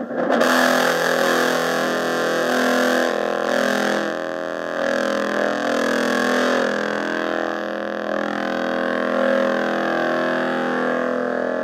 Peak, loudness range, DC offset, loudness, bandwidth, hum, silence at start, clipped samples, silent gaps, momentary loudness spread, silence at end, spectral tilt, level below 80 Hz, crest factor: -2 dBFS; 3 LU; under 0.1%; -20 LUFS; 16.5 kHz; none; 0 s; under 0.1%; none; 6 LU; 0 s; -3.5 dB/octave; -66 dBFS; 18 dB